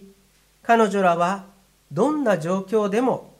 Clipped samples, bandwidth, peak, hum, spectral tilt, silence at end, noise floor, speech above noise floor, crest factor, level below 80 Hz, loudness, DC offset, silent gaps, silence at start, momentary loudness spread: under 0.1%; 15.5 kHz; -4 dBFS; none; -6 dB/octave; 0.15 s; -59 dBFS; 38 dB; 18 dB; -66 dBFS; -21 LUFS; under 0.1%; none; 0 s; 10 LU